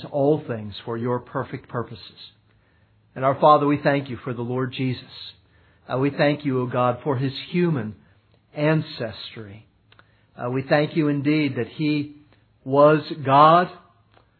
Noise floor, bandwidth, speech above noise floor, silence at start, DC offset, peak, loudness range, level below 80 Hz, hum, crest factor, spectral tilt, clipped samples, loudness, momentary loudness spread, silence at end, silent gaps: -60 dBFS; 4.6 kHz; 38 dB; 0 s; under 0.1%; -2 dBFS; 7 LU; -64 dBFS; none; 22 dB; -10.5 dB/octave; under 0.1%; -22 LUFS; 20 LU; 0.6 s; none